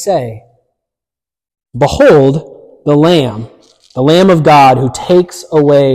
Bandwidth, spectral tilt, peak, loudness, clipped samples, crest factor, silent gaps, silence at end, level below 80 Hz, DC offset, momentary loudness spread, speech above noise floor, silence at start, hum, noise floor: 15 kHz; -6.5 dB/octave; 0 dBFS; -9 LUFS; under 0.1%; 10 dB; none; 0 s; -40 dBFS; under 0.1%; 14 LU; 81 dB; 0 s; none; -89 dBFS